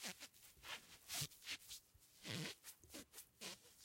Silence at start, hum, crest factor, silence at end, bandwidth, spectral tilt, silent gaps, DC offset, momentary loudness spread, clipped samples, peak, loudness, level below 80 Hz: 0 s; none; 26 dB; 0 s; 16.5 kHz; -2 dB/octave; none; under 0.1%; 12 LU; under 0.1%; -28 dBFS; -52 LUFS; -80 dBFS